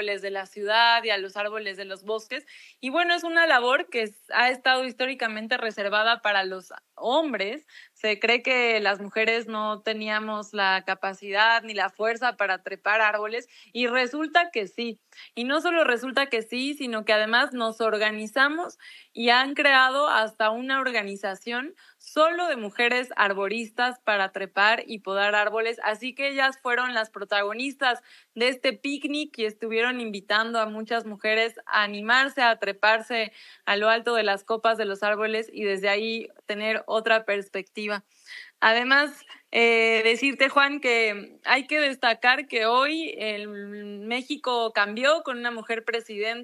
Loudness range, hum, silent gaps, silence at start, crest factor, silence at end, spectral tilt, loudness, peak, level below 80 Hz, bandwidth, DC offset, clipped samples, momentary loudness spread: 4 LU; none; none; 0 s; 22 dB; 0 s; -3 dB/octave; -24 LUFS; -4 dBFS; under -90 dBFS; 12.5 kHz; under 0.1%; under 0.1%; 12 LU